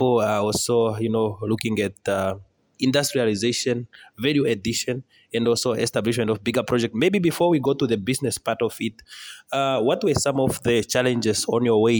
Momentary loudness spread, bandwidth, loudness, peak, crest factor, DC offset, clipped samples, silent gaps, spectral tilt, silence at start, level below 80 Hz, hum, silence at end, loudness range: 8 LU; over 20 kHz; -22 LUFS; -6 dBFS; 16 dB; under 0.1%; under 0.1%; none; -4.5 dB/octave; 0 s; -54 dBFS; none; 0 s; 2 LU